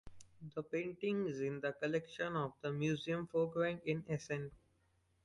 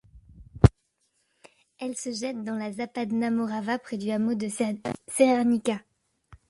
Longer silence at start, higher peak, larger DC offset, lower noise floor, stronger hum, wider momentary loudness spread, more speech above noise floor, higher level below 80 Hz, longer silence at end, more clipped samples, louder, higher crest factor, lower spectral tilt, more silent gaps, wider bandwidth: about the same, 0.05 s vs 0.15 s; second, -22 dBFS vs -2 dBFS; neither; about the same, -76 dBFS vs -73 dBFS; neither; second, 7 LU vs 11 LU; second, 37 dB vs 46 dB; second, -72 dBFS vs -42 dBFS; first, 0.7 s vs 0.15 s; neither; second, -40 LUFS vs -27 LUFS; second, 18 dB vs 24 dB; about the same, -6.5 dB/octave vs -6.5 dB/octave; neither; about the same, 11.5 kHz vs 11.5 kHz